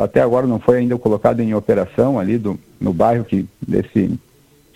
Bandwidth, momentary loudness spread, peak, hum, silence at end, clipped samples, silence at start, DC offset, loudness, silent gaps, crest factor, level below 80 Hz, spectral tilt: 14.5 kHz; 7 LU; 0 dBFS; none; 0.6 s; under 0.1%; 0 s; under 0.1%; -17 LUFS; none; 16 dB; -46 dBFS; -9 dB/octave